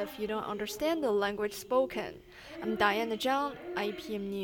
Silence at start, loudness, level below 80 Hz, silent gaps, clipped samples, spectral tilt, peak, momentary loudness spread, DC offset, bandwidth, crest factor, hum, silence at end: 0 s; -32 LUFS; -62 dBFS; none; under 0.1%; -4 dB/octave; -12 dBFS; 11 LU; under 0.1%; 19 kHz; 22 dB; none; 0 s